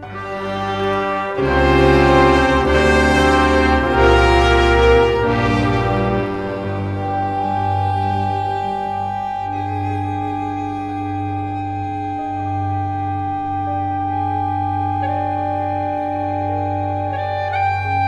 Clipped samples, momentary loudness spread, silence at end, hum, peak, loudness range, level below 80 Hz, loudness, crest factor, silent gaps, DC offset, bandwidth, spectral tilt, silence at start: under 0.1%; 11 LU; 0 s; none; 0 dBFS; 10 LU; -28 dBFS; -18 LUFS; 16 dB; none; under 0.1%; 12 kHz; -6.5 dB/octave; 0 s